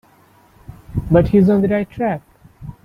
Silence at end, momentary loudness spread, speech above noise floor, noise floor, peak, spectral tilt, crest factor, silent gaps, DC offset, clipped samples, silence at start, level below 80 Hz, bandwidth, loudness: 0.15 s; 18 LU; 36 dB; -51 dBFS; 0 dBFS; -10 dB/octave; 18 dB; none; under 0.1%; under 0.1%; 0.7 s; -36 dBFS; 5.2 kHz; -16 LUFS